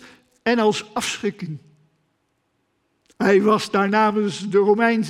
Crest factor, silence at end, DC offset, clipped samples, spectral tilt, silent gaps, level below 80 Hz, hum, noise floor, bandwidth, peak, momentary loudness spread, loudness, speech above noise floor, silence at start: 18 dB; 0 s; under 0.1%; under 0.1%; -5 dB/octave; none; -64 dBFS; none; -70 dBFS; 14 kHz; -4 dBFS; 11 LU; -20 LUFS; 51 dB; 0.05 s